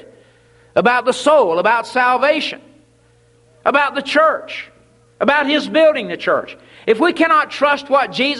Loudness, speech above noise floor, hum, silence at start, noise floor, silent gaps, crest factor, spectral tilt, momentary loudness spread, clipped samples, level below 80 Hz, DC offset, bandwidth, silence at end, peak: -15 LUFS; 38 dB; none; 0.75 s; -53 dBFS; none; 16 dB; -4 dB/octave; 10 LU; under 0.1%; -62 dBFS; under 0.1%; 11.5 kHz; 0 s; 0 dBFS